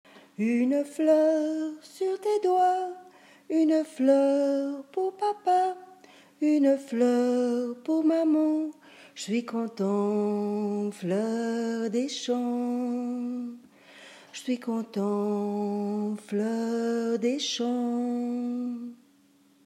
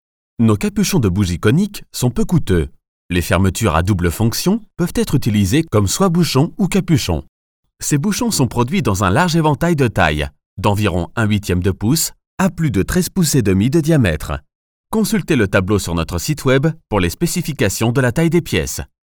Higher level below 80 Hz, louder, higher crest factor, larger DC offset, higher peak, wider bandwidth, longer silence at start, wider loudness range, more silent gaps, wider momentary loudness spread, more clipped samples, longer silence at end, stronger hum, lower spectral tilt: second, under -90 dBFS vs -34 dBFS; second, -27 LUFS vs -17 LUFS; about the same, 16 dB vs 16 dB; second, under 0.1% vs 0.2%; second, -10 dBFS vs 0 dBFS; second, 13 kHz vs over 20 kHz; second, 0.15 s vs 0.4 s; first, 5 LU vs 1 LU; second, none vs 2.88-3.09 s, 7.29-7.63 s, 10.46-10.57 s, 12.27-12.38 s, 14.55-14.84 s; first, 10 LU vs 6 LU; neither; first, 0.7 s vs 0.3 s; neither; about the same, -5.5 dB/octave vs -5.5 dB/octave